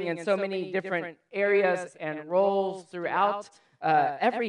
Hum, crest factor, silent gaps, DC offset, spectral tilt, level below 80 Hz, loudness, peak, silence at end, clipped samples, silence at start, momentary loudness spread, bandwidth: none; 16 dB; none; under 0.1%; -6 dB/octave; -86 dBFS; -27 LUFS; -10 dBFS; 0 s; under 0.1%; 0 s; 11 LU; 10.5 kHz